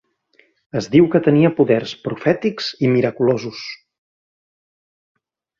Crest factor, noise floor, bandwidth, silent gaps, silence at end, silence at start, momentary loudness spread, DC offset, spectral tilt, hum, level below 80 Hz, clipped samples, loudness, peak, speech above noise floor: 18 dB; -58 dBFS; 7.2 kHz; none; 1.85 s; 0.75 s; 14 LU; under 0.1%; -7 dB/octave; none; -58 dBFS; under 0.1%; -17 LUFS; -2 dBFS; 41 dB